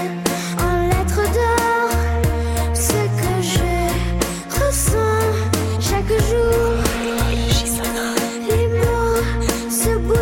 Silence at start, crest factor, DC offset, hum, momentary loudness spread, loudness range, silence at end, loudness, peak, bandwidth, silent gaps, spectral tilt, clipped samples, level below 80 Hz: 0 s; 12 dB; under 0.1%; none; 4 LU; 1 LU; 0 s; -19 LUFS; -6 dBFS; 17 kHz; none; -4.5 dB/octave; under 0.1%; -24 dBFS